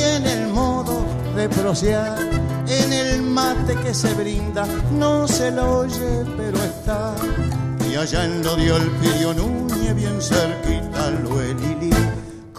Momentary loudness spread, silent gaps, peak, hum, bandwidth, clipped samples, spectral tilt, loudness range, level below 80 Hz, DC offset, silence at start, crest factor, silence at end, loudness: 5 LU; none; -2 dBFS; none; 15.5 kHz; under 0.1%; -5 dB/octave; 2 LU; -30 dBFS; under 0.1%; 0 s; 18 dB; 0 s; -20 LUFS